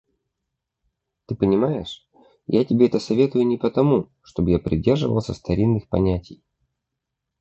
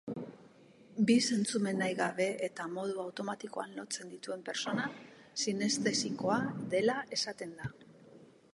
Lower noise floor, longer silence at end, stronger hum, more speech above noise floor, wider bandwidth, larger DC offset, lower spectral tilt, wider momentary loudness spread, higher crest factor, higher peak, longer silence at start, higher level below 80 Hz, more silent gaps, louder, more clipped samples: first, -81 dBFS vs -59 dBFS; first, 1.05 s vs 0.3 s; neither; first, 61 dB vs 25 dB; second, 8.2 kHz vs 11.5 kHz; neither; first, -8.5 dB/octave vs -4 dB/octave; about the same, 11 LU vs 13 LU; about the same, 18 dB vs 20 dB; first, -4 dBFS vs -16 dBFS; first, 1.3 s vs 0.05 s; first, -42 dBFS vs -74 dBFS; neither; first, -21 LUFS vs -34 LUFS; neither